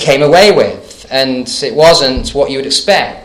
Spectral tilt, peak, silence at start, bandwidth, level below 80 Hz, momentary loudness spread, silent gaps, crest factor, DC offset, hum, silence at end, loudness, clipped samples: -3.5 dB/octave; 0 dBFS; 0 s; 16.5 kHz; -32 dBFS; 10 LU; none; 10 dB; under 0.1%; none; 0.05 s; -9 LUFS; 2%